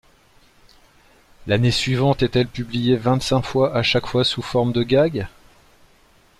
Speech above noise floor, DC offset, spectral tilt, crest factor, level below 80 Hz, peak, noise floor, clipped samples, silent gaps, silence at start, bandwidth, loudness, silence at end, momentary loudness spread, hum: 35 dB; under 0.1%; -6 dB/octave; 16 dB; -44 dBFS; -6 dBFS; -54 dBFS; under 0.1%; none; 1.4 s; 13 kHz; -20 LUFS; 1.1 s; 5 LU; none